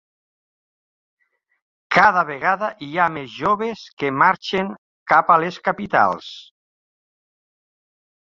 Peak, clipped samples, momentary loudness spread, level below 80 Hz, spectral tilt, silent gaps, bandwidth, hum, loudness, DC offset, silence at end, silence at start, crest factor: -2 dBFS; under 0.1%; 14 LU; -60 dBFS; -5.5 dB/octave; 3.93-3.97 s, 4.78-5.06 s; 7.6 kHz; none; -19 LUFS; under 0.1%; 1.85 s; 1.9 s; 20 dB